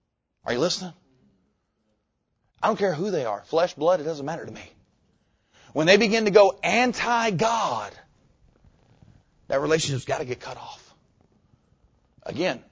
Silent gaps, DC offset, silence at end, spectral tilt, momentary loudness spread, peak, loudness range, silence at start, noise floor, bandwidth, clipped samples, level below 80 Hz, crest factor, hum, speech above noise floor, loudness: none; under 0.1%; 0.15 s; -4.5 dB/octave; 20 LU; -4 dBFS; 9 LU; 0.45 s; -75 dBFS; 8 kHz; under 0.1%; -60 dBFS; 22 dB; none; 51 dB; -23 LUFS